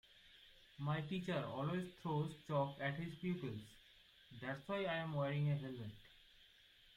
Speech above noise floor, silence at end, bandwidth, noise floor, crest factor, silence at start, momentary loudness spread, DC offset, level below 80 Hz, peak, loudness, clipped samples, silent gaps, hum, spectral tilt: 25 dB; 0.05 s; 11.5 kHz; -68 dBFS; 16 dB; 0.15 s; 22 LU; under 0.1%; -74 dBFS; -28 dBFS; -43 LUFS; under 0.1%; none; none; -7.5 dB/octave